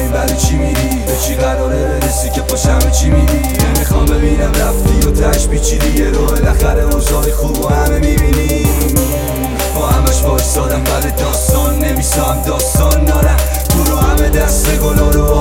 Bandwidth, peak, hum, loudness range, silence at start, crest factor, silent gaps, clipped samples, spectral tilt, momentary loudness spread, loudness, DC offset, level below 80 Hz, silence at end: 17 kHz; 0 dBFS; none; 1 LU; 0 s; 12 dB; none; under 0.1%; -5 dB/octave; 3 LU; -13 LUFS; under 0.1%; -14 dBFS; 0 s